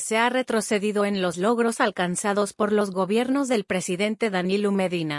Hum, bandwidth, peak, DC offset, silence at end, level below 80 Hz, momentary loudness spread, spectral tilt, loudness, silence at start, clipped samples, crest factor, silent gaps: none; 12 kHz; -8 dBFS; under 0.1%; 0 s; -68 dBFS; 3 LU; -4.5 dB/octave; -24 LUFS; 0 s; under 0.1%; 16 dB; none